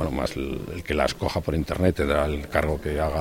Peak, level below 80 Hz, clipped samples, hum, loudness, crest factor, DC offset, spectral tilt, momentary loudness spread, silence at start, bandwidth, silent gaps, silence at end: -4 dBFS; -34 dBFS; under 0.1%; none; -26 LUFS; 20 dB; under 0.1%; -6 dB/octave; 6 LU; 0 s; 16.5 kHz; none; 0 s